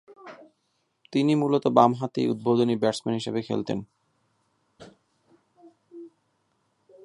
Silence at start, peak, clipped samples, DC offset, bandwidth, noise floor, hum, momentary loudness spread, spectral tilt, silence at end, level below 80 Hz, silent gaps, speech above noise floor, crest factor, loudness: 0.1 s; -4 dBFS; under 0.1%; under 0.1%; 11.5 kHz; -74 dBFS; none; 26 LU; -7 dB/octave; 1 s; -70 dBFS; none; 50 dB; 24 dB; -24 LUFS